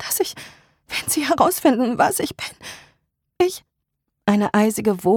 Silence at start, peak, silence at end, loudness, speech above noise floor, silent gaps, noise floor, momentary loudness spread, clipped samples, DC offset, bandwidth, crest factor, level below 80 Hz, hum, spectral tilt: 0 s; -2 dBFS; 0 s; -20 LUFS; 59 dB; none; -77 dBFS; 15 LU; under 0.1%; under 0.1%; 19 kHz; 18 dB; -56 dBFS; none; -4 dB/octave